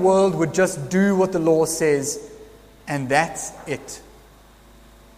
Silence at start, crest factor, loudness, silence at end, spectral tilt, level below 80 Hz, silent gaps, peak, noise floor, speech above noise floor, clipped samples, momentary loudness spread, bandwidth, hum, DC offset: 0 s; 18 dB; -21 LUFS; 1.15 s; -5 dB/octave; -52 dBFS; none; -2 dBFS; -49 dBFS; 29 dB; under 0.1%; 15 LU; 15.5 kHz; none; under 0.1%